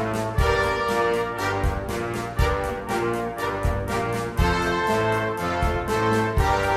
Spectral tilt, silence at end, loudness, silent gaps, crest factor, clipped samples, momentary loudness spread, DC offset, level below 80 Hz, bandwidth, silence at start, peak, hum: -5.5 dB/octave; 0 s; -24 LUFS; none; 16 dB; under 0.1%; 5 LU; under 0.1%; -32 dBFS; 16 kHz; 0 s; -6 dBFS; none